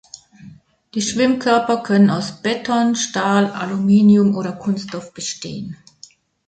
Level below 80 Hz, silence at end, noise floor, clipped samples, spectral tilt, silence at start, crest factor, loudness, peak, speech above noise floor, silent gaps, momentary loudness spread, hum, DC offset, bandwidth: -58 dBFS; 0.75 s; -47 dBFS; under 0.1%; -5 dB/octave; 0.4 s; 16 dB; -17 LUFS; -2 dBFS; 31 dB; none; 15 LU; none; under 0.1%; 9.2 kHz